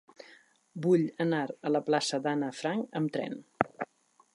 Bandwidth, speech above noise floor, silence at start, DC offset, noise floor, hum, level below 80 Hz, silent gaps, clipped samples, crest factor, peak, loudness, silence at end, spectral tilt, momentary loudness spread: 11.5 kHz; 36 dB; 0.3 s; under 0.1%; -66 dBFS; none; -74 dBFS; none; under 0.1%; 26 dB; -6 dBFS; -31 LUFS; 0.5 s; -5.5 dB/octave; 12 LU